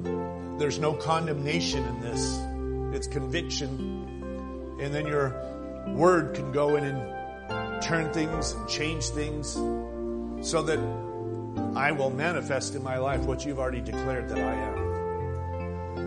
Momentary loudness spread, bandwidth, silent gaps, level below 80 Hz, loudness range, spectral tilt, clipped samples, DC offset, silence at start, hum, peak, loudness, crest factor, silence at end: 9 LU; 10.5 kHz; none; -42 dBFS; 4 LU; -5 dB/octave; under 0.1%; under 0.1%; 0 s; none; -8 dBFS; -30 LUFS; 20 dB; 0 s